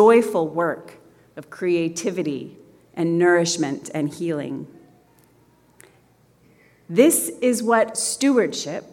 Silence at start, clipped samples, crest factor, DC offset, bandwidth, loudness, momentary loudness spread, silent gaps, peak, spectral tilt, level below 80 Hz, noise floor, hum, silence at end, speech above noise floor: 0 s; under 0.1%; 18 dB; under 0.1%; 17 kHz; -21 LUFS; 17 LU; none; -2 dBFS; -4 dB/octave; -70 dBFS; -57 dBFS; none; 0.1 s; 37 dB